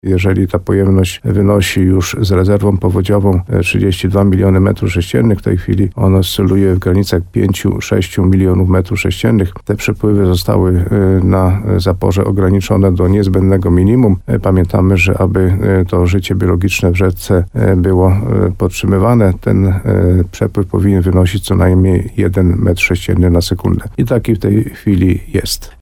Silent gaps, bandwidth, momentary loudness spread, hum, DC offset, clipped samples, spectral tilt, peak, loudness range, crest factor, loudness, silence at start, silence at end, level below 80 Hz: none; 16 kHz; 4 LU; none; under 0.1%; under 0.1%; -7 dB/octave; 0 dBFS; 2 LU; 10 dB; -12 LUFS; 0.05 s; 0.1 s; -28 dBFS